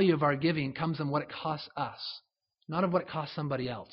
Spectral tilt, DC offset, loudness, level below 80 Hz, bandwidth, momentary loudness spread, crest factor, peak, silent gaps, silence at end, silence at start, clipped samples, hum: -5 dB/octave; under 0.1%; -32 LUFS; -66 dBFS; 5.8 kHz; 10 LU; 18 dB; -14 dBFS; none; 0.05 s; 0 s; under 0.1%; none